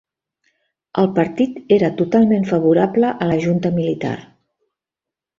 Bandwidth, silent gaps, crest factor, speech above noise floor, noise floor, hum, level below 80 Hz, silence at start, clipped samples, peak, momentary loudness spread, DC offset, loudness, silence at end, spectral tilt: 7.4 kHz; none; 16 dB; 70 dB; -87 dBFS; none; -56 dBFS; 0.95 s; under 0.1%; -2 dBFS; 8 LU; under 0.1%; -17 LUFS; 1.15 s; -8.5 dB/octave